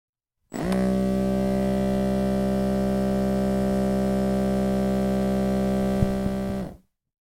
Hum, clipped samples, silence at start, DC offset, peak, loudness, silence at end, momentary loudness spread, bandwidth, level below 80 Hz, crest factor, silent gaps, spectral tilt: none; under 0.1%; 0.5 s; under 0.1%; -8 dBFS; -24 LUFS; 0.5 s; 4 LU; 16 kHz; -38 dBFS; 16 dB; none; -7.5 dB/octave